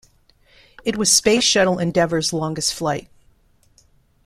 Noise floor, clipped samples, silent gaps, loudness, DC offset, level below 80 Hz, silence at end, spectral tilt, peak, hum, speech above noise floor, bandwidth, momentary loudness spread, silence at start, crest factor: -57 dBFS; under 0.1%; none; -18 LUFS; under 0.1%; -50 dBFS; 1.25 s; -3 dB/octave; -2 dBFS; none; 38 dB; 15.5 kHz; 11 LU; 0.85 s; 20 dB